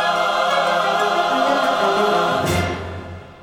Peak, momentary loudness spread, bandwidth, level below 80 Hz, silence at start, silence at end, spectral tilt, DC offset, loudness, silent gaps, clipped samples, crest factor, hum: -6 dBFS; 11 LU; over 20 kHz; -46 dBFS; 0 s; 0 s; -4 dB/octave; under 0.1%; -18 LUFS; none; under 0.1%; 12 dB; none